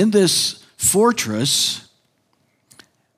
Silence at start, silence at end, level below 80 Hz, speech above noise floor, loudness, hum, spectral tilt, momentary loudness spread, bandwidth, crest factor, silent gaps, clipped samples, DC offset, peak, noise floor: 0 s; 1.4 s; -56 dBFS; 47 dB; -17 LUFS; none; -3 dB/octave; 7 LU; 16 kHz; 16 dB; none; under 0.1%; under 0.1%; -4 dBFS; -65 dBFS